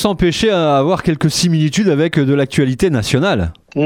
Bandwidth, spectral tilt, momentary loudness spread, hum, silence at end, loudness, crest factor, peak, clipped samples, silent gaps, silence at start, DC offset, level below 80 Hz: 16.5 kHz; -5.5 dB/octave; 2 LU; none; 0 s; -14 LUFS; 14 dB; 0 dBFS; under 0.1%; none; 0 s; under 0.1%; -36 dBFS